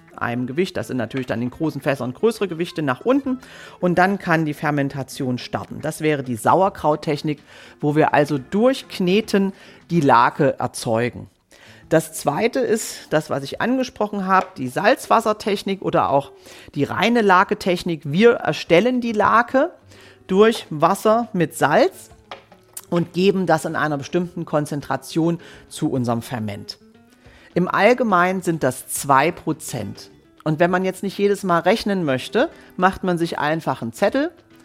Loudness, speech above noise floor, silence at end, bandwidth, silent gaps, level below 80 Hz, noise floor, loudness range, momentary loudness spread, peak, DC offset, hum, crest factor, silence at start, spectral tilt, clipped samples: -20 LUFS; 29 dB; 0.35 s; 16.5 kHz; none; -56 dBFS; -49 dBFS; 4 LU; 11 LU; -2 dBFS; under 0.1%; none; 18 dB; 0.2 s; -5.5 dB/octave; under 0.1%